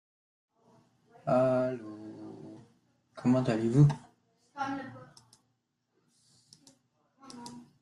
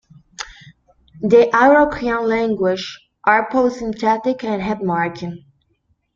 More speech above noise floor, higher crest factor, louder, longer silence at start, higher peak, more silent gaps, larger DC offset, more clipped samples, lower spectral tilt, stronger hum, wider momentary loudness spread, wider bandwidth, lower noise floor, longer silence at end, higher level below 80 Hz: first, 52 dB vs 48 dB; about the same, 22 dB vs 18 dB; second, -29 LUFS vs -17 LUFS; first, 1.25 s vs 0.4 s; second, -10 dBFS vs 0 dBFS; neither; neither; neither; first, -8.5 dB/octave vs -6 dB/octave; neither; first, 24 LU vs 19 LU; first, 11 kHz vs 7.4 kHz; first, -79 dBFS vs -65 dBFS; second, 0.2 s vs 0.8 s; second, -66 dBFS vs -50 dBFS